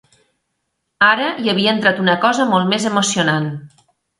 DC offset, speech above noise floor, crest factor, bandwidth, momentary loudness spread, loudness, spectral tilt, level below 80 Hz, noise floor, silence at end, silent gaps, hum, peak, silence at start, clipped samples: under 0.1%; 57 dB; 18 dB; 11.5 kHz; 5 LU; -15 LUFS; -4 dB/octave; -62 dBFS; -73 dBFS; 0.55 s; none; none; 0 dBFS; 1 s; under 0.1%